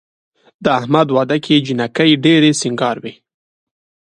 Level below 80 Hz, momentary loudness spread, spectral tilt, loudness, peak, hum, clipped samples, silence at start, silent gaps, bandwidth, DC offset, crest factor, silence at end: -58 dBFS; 10 LU; -5 dB/octave; -14 LUFS; 0 dBFS; none; under 0.1%; 0.6 s; none; 11 kHz; under 0.1%; 16 dB; 0.95 s